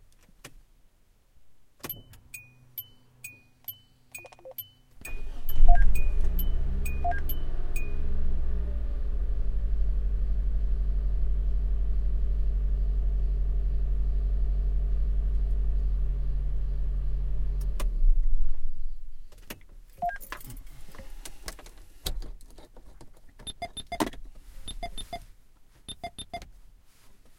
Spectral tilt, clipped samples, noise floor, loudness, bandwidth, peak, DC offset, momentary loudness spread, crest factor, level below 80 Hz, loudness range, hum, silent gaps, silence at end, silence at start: -5.5 dB/octave; under 0.1%; -61 dBFS; -33 LUFS; 15.5 kHz; -4 dBFS; under 0.1%; 16 LU; 22 dB; -28 dBFS; 12 LU; none; none; 0.3 s; 0.45 s